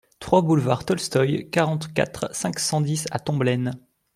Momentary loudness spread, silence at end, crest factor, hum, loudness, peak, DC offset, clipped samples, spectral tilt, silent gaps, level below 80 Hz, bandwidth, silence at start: 6 LU; 0.4 s; 20 dB; none; -23 LUFS; -4 dBFS; under 0.1%; under 0.1%; -5.5 dB/octave; none; -56 dBFS; 15.5 kHz; 0.2 s